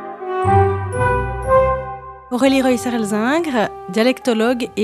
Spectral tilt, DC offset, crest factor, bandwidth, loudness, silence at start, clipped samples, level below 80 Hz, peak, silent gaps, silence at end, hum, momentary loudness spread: -6 dB/octave; under 0.1%; 16 dB; 14.5 kHz; -17 LUFS; 0 s; under 0.1%; -36 dBFS; 0 dBFS; none; 0 s; none; 8 LU